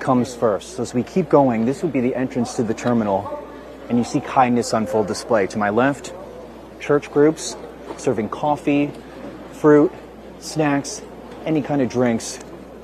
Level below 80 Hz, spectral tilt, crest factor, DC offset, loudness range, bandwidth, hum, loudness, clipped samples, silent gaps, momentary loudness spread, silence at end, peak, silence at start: -50 dBFS; -6 dB/octave; 18 dB; under 0.1%; 2 LU; 13.5 kHz; none; -20 LUFS; under 0.1%; none; 19 LU; 0 s; -2 dBFS; 0 s